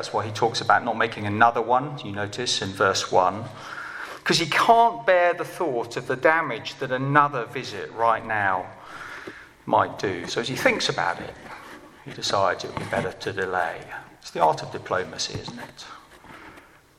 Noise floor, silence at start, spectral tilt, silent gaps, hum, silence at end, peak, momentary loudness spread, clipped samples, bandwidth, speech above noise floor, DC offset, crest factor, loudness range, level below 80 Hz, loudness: -49 dBFS; 0 s; -4 dB/octave; none; none; 0.4 s; -2 dBFS; 19 LU; under 0.1%; 15.5 kHz; 26 dB; under 0.1%; 22 dB; 6 LU; -60 dBFS; -23 LUFS